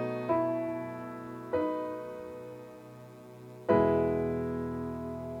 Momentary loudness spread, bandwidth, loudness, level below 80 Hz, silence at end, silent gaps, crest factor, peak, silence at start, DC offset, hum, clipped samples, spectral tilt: 22 LU; 17.5 kHz; -32 LUFS; -56 dBFS; 0 s; none; 20 dB; -12 dBFS; 0 s; under 0.1%; none; under 0.1%; -8.5 dB/octave